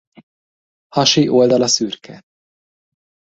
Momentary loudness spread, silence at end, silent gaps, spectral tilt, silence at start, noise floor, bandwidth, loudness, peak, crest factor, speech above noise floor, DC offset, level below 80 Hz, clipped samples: 12 LU; 1.15 s; none; -4 dB/octave; 0.95 s; under -90 dBFS; 8 kHz; -14 LUFS; 0 dBFS; 18 dB; over 75 dB; under 0.1%; -60 dBFS; under 0.1%